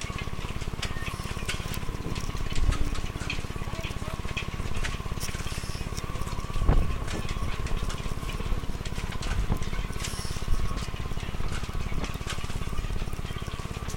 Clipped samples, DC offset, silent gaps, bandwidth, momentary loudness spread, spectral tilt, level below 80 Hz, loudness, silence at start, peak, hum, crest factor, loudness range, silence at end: under 0.1%; under 0.1%; none; 17 kHz; 5 LU; -4.5 dB/octave; -32 dBFS; -33 LUFS; 0 s; -8 dBFS; none; 20 dB; 2 LU; 0 s